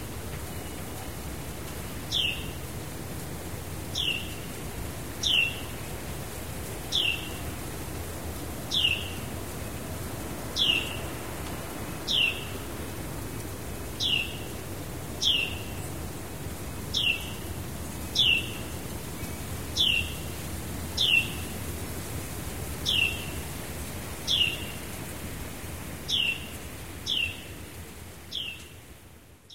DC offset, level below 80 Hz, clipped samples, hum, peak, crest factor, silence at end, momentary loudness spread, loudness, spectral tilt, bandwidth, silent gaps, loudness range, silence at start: 0.6%; -44 dBFS; under 0.1%; none; -10 dBFS; 22 dB; 0 s; 14 LU; -30 LUFS; -2.5 dB/octave; 16 kHz; none; 4 LU; 0 s